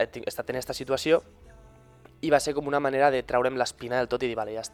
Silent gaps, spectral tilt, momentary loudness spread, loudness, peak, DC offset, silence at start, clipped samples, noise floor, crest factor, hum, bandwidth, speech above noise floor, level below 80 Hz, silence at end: none; -4 dB/octave; 9 LU; -27 LUFS; -6 dBFS; under 0.1%; 0 s; under 0.1%; -53 dBFS; 20 dB; none; 18.5 kHz; 27 dB; -56 dBFS; 0.05 s